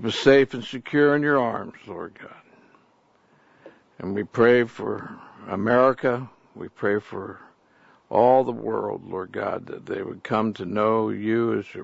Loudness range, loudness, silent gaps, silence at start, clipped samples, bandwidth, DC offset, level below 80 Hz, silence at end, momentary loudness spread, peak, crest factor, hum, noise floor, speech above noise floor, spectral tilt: 3 LU; -23 LUFS; none; 0 s; under 0.1%; 8 kHz; under 0.1%; -64 dBFS; 0 s; 19 LU; -2 dBFS; 22 dB; none; -61 dBFS; 38 dB; -6.5 dB/octave